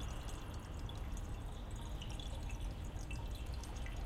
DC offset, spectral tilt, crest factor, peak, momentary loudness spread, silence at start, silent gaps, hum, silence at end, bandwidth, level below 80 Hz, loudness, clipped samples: under 0.1%; -5 dB/octave; 12 dB; -32 dBFS; 2 LU; 0 s; none; none; 0 s; 16 kHz; -46 dBFS; -47 LUFS; under 0.1%